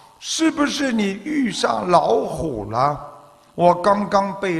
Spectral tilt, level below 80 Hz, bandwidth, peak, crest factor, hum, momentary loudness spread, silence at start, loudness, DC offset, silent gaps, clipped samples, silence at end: -4.5 dB/octave; -48 dBFS; 13 kHz; -2 dBFS; 18 dB; none; 9 LU; 0.2 s; -19 LUFS; under 0.1%; none; under 0.1%; 0 s